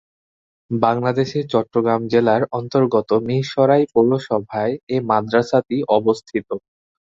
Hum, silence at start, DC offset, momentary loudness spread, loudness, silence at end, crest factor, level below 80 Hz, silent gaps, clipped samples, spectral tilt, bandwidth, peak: none; 0.7 s; under 0.1%; 7 LU; -19 LUFS; 0.45 s; 18 dB; -58 dBFS; 4.83-4.87 s; under 0.1%; -7.5 dB/octave; 7.8 kHz; 0 dBFS